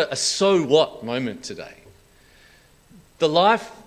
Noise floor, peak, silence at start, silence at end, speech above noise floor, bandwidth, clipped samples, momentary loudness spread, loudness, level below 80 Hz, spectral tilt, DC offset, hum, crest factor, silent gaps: -53 dBFS; -4 dBFS; 0 s; 0.1 s; 32 dB; 14.5 kHz; under 0.1%; 18 LU; -20 LUFS; -60 dBFS; -3.5 dB/octave; under 0.1%; none; 20 dB; none